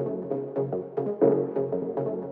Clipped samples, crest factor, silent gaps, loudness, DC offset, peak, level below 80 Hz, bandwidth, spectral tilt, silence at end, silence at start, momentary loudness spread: under 0.1%; 18 dB; none; -28 LUFS; under 0.1%; -8 dBFS; -80 dBFS; 3.2 kHz; -12.5 dB/octave; 0 s; 0 s; 8 LU